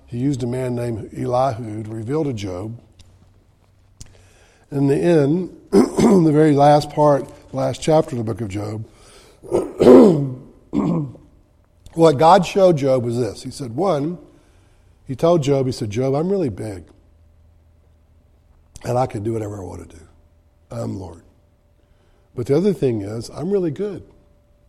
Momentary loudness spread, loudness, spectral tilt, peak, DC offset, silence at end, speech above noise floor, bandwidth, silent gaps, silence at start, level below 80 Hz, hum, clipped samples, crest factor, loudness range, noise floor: 19 LU; -18 LUFS; -7.5 dB/octave; 0 dBFS; under 0.1%; 0.65 s; 39 dB; 14 kHz; none; 0.1 s; -48 dBFS; none; under 0.1%; 20 dB; 12 LU; -56 dBFS